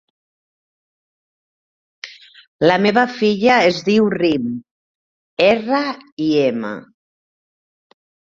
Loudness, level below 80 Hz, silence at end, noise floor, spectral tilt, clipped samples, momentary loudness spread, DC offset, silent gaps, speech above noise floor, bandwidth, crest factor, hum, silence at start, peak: -16 LUFS; -58 dBFS; 1.5 s; under -90 dBFS; -5.5 dB/octave; under 0.1%; 20 LU; under 0.1%; 2.48-2.59 s, 4.71-5.37 s, 6.12-6.17 s; over 74 dB; 7.6 kHz; 18 dB; none; 2.05 s; 0 dBFS